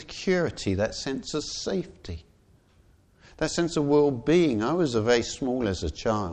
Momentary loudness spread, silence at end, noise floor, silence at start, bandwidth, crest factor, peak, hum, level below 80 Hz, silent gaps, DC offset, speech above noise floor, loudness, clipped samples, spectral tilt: 10 LU; 0 s; -60 dBFS; 0 s; 9.4 kHz; 18 dB; -10 dBFS; none; -48 dBFS; none; under 0.1%; 34 dB; -26 LUFS; under 0.1%; -5 dB/octave